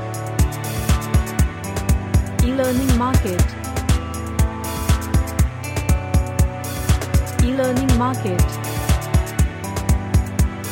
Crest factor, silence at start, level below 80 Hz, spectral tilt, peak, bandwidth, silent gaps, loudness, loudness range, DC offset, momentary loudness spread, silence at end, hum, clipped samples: 16 dB; 0 s; -22 dBFS; -6 dB/octave; -4 dBFS; 17 kHz; none; -20 LUFS; 1 LU; under 0.1%; 4 LU; 0 s; none; under 0.1%